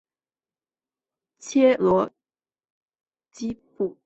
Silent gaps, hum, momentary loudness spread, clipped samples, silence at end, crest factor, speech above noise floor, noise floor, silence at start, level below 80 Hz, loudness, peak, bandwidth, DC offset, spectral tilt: 2.70-2.86 s; none; 15 LU; under 0.1%; 0.15 s; 20 dB; over 68 dB; under -90 dBFS; 1.45 s; -64 dBFS; -23 LUFS; -8 dBFS; 8.2 kHz; under 0.1%; -6 dB/octave